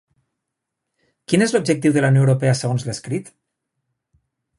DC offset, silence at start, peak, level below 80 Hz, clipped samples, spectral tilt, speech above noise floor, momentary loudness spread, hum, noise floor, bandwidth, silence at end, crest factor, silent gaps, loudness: under 0.1%; 1.3 s; -2 dBFS; -58 dBFS; under 0.1%; -6 dB/octave; 63 dB; 11 LU; none; -80 dBFS; 11.5 kHz; 1.35 s; 18 dB; none; -18 LUFS